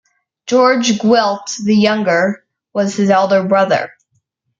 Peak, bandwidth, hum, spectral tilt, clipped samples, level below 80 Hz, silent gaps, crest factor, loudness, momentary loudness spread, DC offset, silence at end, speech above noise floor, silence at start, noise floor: -2 dBFS; 7.6 kHz; none; -4.5 dB/octave; under 0.1%; -60 dBFS; none; 14 dB; -14 LUFS; 9 LU; under 0.1%; 0.7 s; 52 dB; 0.45 s; -65 dBFS